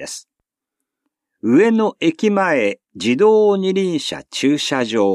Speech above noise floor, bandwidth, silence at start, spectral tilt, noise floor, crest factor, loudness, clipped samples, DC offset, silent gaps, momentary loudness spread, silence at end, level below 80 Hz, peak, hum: 65 dB; 12.5 kHz; 0 s; -5 dB/octave; -81 dBFS; 14 dB; -17 LUFS; under 0.1%; under 0.1%; none; 10 LU; 0 s; -66 dBFS; -4 dBFS; none